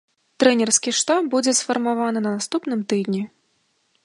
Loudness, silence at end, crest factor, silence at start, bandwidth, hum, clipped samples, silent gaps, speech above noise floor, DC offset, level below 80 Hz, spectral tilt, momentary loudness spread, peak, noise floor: -20 LUFS; 0.8 s; 20 dB; 0.4 s; 11.5 kHz; none; under 0.1%; none; 47 dB; under 0.1%; -74 dBFS; -3 dB/octave; 7 LU; -2 dBFS; -67 dBFS